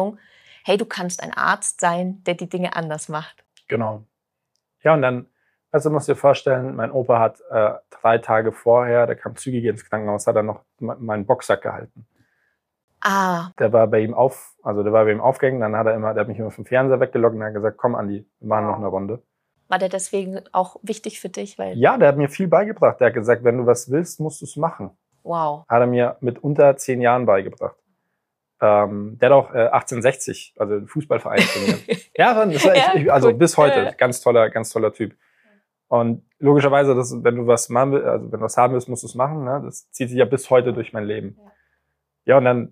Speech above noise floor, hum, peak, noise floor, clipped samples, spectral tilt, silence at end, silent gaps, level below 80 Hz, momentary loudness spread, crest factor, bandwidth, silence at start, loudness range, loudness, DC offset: 59 dB; none; -2 dBFS; -77 dBFS; under 0.1%; -5.5 dB/octave; 0.05 s; 12.84-12.88 s; -68 dBFS; 13 LU; 18 dB; 15.5 kHz; 0 s; 7 LU; -19 LUFS; under 0.1%